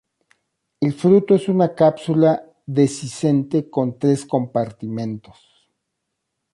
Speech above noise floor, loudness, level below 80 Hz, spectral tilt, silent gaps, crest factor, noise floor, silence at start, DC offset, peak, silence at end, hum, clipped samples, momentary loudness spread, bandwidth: 59 dB; -19 LUFS; -62 dBFS; -7.5 dB/octave; none; 16 dB; -77 dBFS; 0.8 s; under 0.1%; -2 dBFS; 1.35 s; none; under 0.1%; 11 LU; 11.5 kHz